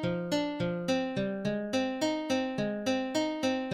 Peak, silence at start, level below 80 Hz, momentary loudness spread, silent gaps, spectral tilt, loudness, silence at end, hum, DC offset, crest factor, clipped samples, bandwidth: -18 dBFS; 0 s; -64 dBFS; 2 LU; none; -5 dB/octave; -31 LUFS; 0 s; none; under 0.1%; 12 dB; under 0.1%; 15.5 kHz